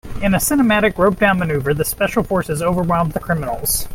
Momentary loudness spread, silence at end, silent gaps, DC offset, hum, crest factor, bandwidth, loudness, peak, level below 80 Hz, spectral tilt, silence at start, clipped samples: 6 LU; 0 s; none; under 0.1%; none; 16 dB; 16.5 kHz; -17 LUFS; 0 dBFS; -34 dBFS; -5 dB/octave; 0.05 s; under 0.1%